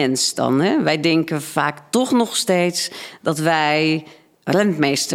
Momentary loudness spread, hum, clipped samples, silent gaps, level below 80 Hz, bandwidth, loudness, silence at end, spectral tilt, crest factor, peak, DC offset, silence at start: 7 LU; none; under 0.1%; none; -66 dBFS; 16.5 kHz; -19 LUFS; 0 s; -4 dB/octave; 18 dB; -2 dBFS; under 0.1%; 0 s